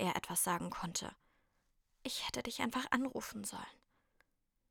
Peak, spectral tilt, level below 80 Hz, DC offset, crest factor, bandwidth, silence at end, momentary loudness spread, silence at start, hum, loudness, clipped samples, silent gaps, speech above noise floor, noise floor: -18 dBFS; -3 dB/octave; -68 dBFS; under 0.1%; 24 dB; over 20 kHz; 0.95 s; 14 LU; 0 s; none; -39 LUFS; under 0.1%; none; 38 dB; -78 dBFS